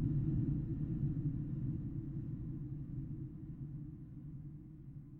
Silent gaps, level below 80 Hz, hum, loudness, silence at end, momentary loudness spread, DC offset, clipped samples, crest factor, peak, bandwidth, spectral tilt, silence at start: none; -50 dBFS; none; -42 LUFS; 0 s; 14 LU; under 0.1%; under 0.1%; 16 dB; -24 dBFS; 2.2 kHz; -12.5 dB/octave; 0 s